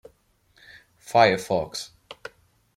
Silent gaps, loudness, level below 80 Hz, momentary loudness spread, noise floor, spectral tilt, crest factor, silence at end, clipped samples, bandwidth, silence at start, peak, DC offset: none; -23 LUFS; -62 dBFS; 23 LU; -63 dBFS; -4 dB/octave; 22 dB; 0.65 s; under 0.1%; 16 kHz; 1.1 s; -4 dBFS; under 0.1%